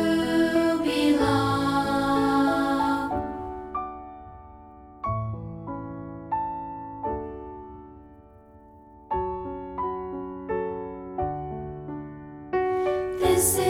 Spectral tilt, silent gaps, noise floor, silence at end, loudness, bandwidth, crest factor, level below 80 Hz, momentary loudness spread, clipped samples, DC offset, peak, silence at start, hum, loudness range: -5 dB/octave; none; -51 dBFS; 0 s; -27 LUFS; 17 kHz; 18 dB; -48 dBFS; 19 LU; under 0.1%; under 0.1%; -10 dBFS; 0 s; none; 11 LU